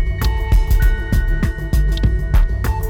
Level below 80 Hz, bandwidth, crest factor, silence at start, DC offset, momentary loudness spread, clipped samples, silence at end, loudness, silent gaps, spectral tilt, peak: -16 dBFS; 17.5 kHz; 10 dB; 0 s; under 0.1%; 3 LU; under 0.1%; 0 s; -19 LUFS; none; -6.5 dB/octave; -4 dBFS